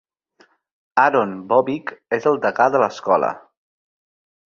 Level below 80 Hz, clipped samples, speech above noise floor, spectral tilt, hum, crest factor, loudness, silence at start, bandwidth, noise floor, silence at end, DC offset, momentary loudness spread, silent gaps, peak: -66 dBFS; under 0.1%; 39 dB; -6 dB/octave; none; 20 dB; -19 LUFS; 0.95 s; 7.2 kHz; -57 dBFS; 1.1 s; under 0.1%; 9 LU; none; 0 dBFS